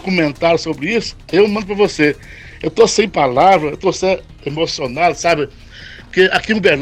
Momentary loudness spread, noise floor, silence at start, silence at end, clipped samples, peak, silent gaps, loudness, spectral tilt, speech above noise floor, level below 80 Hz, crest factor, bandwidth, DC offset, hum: 12 LU; -35 dBFS; 0.05 s; 0 s; under 0.1%; 0 dBFS; none; -15 LUFS; -4.5 dB/octave; 20 dB; -42 dBFS; 14 dB; 11.5 kHz; under 0.1%; none